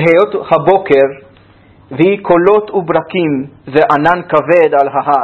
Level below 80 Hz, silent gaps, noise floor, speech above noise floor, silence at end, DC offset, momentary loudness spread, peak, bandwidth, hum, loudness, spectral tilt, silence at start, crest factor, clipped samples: -48 dBFS; none; -43 dBFS; 32 dB; 0 s; under 0.1%; 6 LU; 0 dBFS; 6.4 kHz; none; -11 LUFS; -8 dB/octave; 0 s; 12 dB; 0.3%